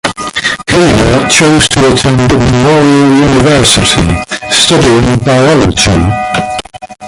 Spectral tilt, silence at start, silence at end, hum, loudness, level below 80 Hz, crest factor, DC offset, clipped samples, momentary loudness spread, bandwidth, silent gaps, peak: -4.5 dB/octave; 0.05 s; 0 s; none; -7 LUFS; -24 dBFS; 8 dB; under 0.1%; 0.3%; 8 LU; 16 kHz; none; 0 dBFS